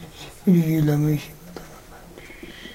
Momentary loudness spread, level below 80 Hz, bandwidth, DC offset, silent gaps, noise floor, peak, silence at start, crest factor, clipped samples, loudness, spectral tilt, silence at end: 24 LU; -48 dBFS; 16 kHz; under 0.1%; none; -43 dBFS; -8 dBFS; 0 s; 16 dB; under 0.1%; -21 LUFS; -7.5 dB/octave; 0 s